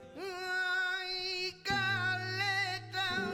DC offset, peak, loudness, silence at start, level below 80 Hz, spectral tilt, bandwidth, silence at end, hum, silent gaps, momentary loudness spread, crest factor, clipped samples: under 0.1%; -22 dBFS; -33 LUFS; 0 s; -64 dBFS; -3.5 dB/octave; 19 kHz; 0 s; none; none; 4 LU; 14 dB; under 0.1%